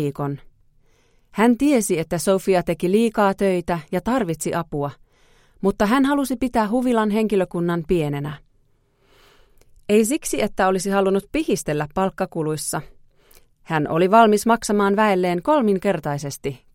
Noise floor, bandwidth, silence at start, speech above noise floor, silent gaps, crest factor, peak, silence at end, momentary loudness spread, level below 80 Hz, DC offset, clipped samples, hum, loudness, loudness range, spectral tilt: -61 dBFS; 16.5 kHz; 0 s; 41 dB; none; 20 dB; -2 dBFS; 0.2 s; 10 LU; -46 dBFS; under 0.1%; under 0.1%; none; -20 LUFS; 5 LU; -5.5 dB/octave